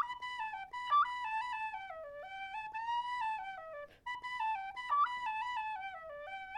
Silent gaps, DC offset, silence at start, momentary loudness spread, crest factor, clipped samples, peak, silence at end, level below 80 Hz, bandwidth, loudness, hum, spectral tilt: none; under 0.1%; 0 s; 14 LU; 16 dB; under 0.1%; -24 dBFS; 0 s; -72 dBFS; 11.5 kHz; -38 LUFS; none; -1 dB/octave